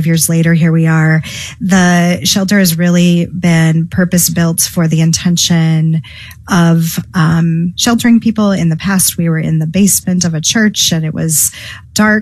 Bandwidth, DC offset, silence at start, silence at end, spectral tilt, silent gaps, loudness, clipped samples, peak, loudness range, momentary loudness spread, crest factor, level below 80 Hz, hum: 14.5 kHz; under 0.1%; 0 s; 0 s; -4.5 dB/octave; none; -11 LUFS; under 0.1%; 0 dBFS; 1 LU; 5 LU; 10 dB; -42 dBFS; none